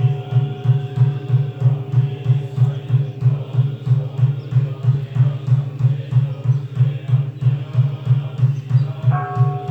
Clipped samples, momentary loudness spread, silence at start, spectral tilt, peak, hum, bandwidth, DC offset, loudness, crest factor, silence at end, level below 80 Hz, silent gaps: under 0.1%; 3 LU; 0 s; -10 dB/octave; -6 dBFS; none; 4 kHz; under 0.1%; -19 LUFS; 12 dB; 0 s; -54 dBFS; none